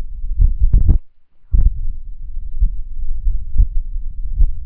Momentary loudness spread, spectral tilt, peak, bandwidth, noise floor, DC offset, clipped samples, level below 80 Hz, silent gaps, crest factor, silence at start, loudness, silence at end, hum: 15 LU; -13 dB/octave; 0 dBFS; 0.8 kHz; -39 dBFS; under 0.1%; under 0.1%; -16 dBFS; none; 14 dB; 0 s; -22 LUFS; 0 s; none